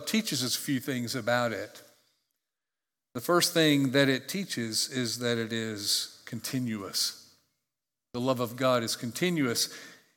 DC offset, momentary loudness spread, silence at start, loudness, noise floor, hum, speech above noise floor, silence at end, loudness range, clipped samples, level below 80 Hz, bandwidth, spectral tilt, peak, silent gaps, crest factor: under 0.1%; 13 LU; 0 s; -29 LUFS; under -90 dBFS; none; over 61 dB; 0.2 s; 5 LU; under 0.1%; -78 dBFS; 18 kHz; -3.5 dB/octave; -10 dBFS; none; 22 dB